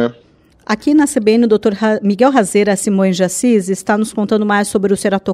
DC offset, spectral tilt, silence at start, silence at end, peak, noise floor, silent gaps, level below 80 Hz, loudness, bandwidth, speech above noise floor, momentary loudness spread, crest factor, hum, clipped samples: under 0.1%; -5 dB/octave; 0 s; 0 s; 0 dBFS; -49 dBFS; none; -52 dBFS; -14 LUFS; 14 kHz; 36 dB; 5 LU; 14 dB; none; under 0.1%